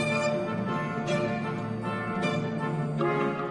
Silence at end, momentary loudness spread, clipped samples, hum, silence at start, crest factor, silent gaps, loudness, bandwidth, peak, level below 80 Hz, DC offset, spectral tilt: 0 s; 4 LU; under 0.1%; none; 0 s; 14 dB; none; -29 LUFS; 11.5 kHz; -14 dBFS; -60 dBFS; under 0.1%; -6.5 dB/octave